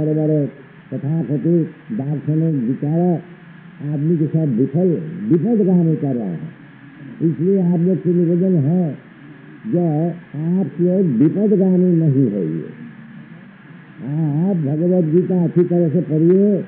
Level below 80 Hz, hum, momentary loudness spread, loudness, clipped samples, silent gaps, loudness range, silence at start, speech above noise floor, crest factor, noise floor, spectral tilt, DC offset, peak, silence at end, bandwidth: -68 dBFS; none; 14 LU; -18 LUFS; under 0.1%; none; 3 LU; 0 s; 24 dB; 14 dB; -40 dBFS; -12 dB/octave; under 0.1%; -4 dBFS; 0 s; 3.4 kHz